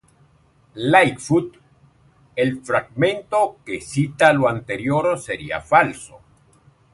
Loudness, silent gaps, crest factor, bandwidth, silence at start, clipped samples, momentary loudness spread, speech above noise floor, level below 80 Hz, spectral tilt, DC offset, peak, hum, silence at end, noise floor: -19 LUFS; none; 20 dB; 11.5 kHz; 0.75 s; under 0.1%; 11 LU; 37 dB; -54 dBFS; -5.5 dB/octave; under 0.1%; 0 dBFS; none; 0.75 s; -56 dBFS